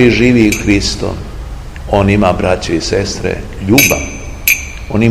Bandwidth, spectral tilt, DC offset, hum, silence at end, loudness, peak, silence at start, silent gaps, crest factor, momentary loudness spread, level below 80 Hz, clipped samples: over 20 kHz; -4.5 dB/octave; 0.7%; none; 0 s; -12 LUFS; 0 dBFS; 0 s; none; 12 dB; 16 LU; -26 dBFS; 0.7%